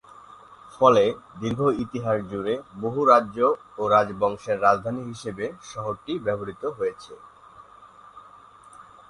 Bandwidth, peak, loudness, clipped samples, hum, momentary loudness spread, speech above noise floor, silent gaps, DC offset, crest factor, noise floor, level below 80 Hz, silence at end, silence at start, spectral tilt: 11 kHz; -2 dBFS; -24 LUFS; under 0.1%; none; 14 LU; 26 dB; none; under 0.1%; 22 dB; -49 dBFS; -58 dBFS; 0.3 s; 0.5 s; -6.5 dB/octave